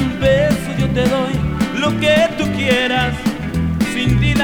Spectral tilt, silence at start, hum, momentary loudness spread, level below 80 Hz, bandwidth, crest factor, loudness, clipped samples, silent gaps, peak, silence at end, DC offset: -6 dB/octave; 0 s; none; 6 LU; -30 dBFS; over 20 kHz; 14 dB; -16 LUFS; under 0.1%; none; -2 dBFS; 0 s; under 0.1%